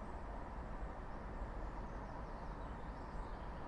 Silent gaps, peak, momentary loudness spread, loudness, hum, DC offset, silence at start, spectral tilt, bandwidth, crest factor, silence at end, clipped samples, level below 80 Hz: none; -34 dBFS; 1 LU; -49 LUFS; none; under 0.1%; 0 s; -7.5 dB/octave; 9.8 kHz; 12 dB; 0 s; under 0.1%; -48 dBFS